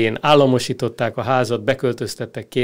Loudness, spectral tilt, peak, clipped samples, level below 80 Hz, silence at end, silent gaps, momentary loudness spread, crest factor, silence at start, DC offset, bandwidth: -19 LUFS; -5.5 dB/octave; -2 dBFS; under 0.1%; -54 dBFS; 0 s; none; 12 LU; 16 dB; 0 s; under 0.1%; 16 kHz